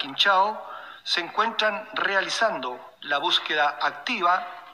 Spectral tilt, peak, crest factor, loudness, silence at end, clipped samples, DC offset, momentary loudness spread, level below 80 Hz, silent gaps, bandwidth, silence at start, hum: -1.5 dB/octave; -8 dBFS; 18 dB; -24 LUFS; 0 s; under 0.1%; under 0.1%; 14 LU; -80 dBFS; none; 15.5 kHz; 0 s; none